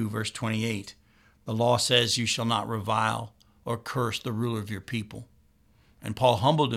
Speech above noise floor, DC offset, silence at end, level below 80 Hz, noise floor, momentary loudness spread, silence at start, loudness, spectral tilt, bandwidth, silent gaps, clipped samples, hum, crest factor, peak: 35 dB; under 0.1%; 0 s; -60 dBFS; -62 dBFS; 20 LU; 0 s; -27 LUFS; -4.5 dB/octave; 15.5 kHz; none; under 0.1%; none; 22 dB; -6 dBFS